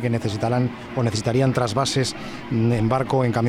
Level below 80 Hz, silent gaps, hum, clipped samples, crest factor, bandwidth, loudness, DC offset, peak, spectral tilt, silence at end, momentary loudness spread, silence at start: -48 dBFS; none; none; under 0.1%; 14 dB; 13 kHz; -22 LUFS; under 0.1%; -8 dBFS; -6 dB/octave; 0 s; 6 LU; 0 s